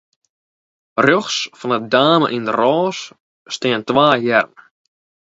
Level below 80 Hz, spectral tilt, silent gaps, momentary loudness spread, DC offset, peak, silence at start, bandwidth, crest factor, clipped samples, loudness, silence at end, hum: -62 dBFS; -4.5 dB/octave; 3.20-3.45 s; 13 LU; under 0.1%; 0 dBFS; 0.95 s; 8 kHz; 18 dB; under 0.1%; -16 LUFS; 0.75 s; none